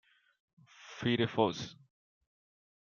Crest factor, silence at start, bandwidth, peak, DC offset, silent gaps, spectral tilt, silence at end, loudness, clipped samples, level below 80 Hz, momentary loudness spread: 24 dB; 0.8 s; 7.2 kHz; -14 dBFS; under 0.1%; none; -6 dB/octave; 1.1 s; -33 LUFS; under 0.1%; -72 dBFS; 16 LU